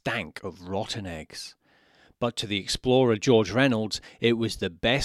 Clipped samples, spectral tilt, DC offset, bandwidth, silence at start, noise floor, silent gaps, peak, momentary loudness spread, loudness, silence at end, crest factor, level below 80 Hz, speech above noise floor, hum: under 0.1%; -5 dB/octave; under 0.1%; 14 kHz; 0.05 s; -60 dBFS; none; -6 dBFS; 16 LU; -26 LUFS; 0 s; 20 dB; -52 dBFS; 34 dB; none